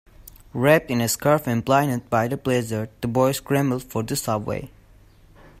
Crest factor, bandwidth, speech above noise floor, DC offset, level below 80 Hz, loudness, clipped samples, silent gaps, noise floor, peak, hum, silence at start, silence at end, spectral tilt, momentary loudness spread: 20 dB; 16 kHz; 30 dB; under 0.1%; -50 dBFS; -22 LUFS; under 0.1%; none; -51 dBFS; -4 dBFS; none; 0.2 s; 0.9 s; -5.5 dB/octave; 9 LU